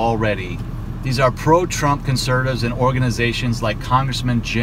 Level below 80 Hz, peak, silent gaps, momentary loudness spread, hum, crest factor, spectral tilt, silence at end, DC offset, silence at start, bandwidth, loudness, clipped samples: -32 dBFS; -2 dBFS; none; 8 LU; none; 16 dB; -5.5 dB/octave; 0 s; under 0.1%; 0 s; 16 kHz; -19 LUFS; under 0.1%